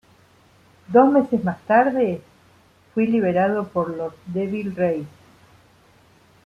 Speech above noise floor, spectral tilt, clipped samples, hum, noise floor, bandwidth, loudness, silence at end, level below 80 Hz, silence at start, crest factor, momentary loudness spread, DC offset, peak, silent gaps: 35 dB; -9 dB/octave; under 0.1%; none; -55 dBFS; 9.8 kHz; -21 LUFS; 1.35 s; -62 dBFS; 0.9 s; 20 dB; 13 LU; under 0.1%; -2 dBFS; none